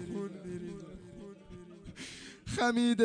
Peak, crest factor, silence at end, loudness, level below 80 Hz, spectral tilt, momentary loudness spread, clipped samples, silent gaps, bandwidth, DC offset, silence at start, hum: -14 dBFS; 20 dB; 0 s; -36 LUFS; -60 dBFS; -5 dB/octave; 21 LU; under 0.1%; none; 10 kHz; under 0.1%; 0 s; none